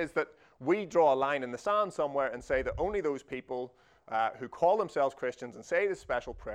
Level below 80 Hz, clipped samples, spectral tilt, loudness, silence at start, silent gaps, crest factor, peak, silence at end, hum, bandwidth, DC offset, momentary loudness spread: -56 dBFS; under 0.1%; -5.5 dB/octave; -31 LUFS; 0 s; none; 18 dB; -14 dBFS; 0 s; none; 10.5 kHz; under 0.1%; 12 LU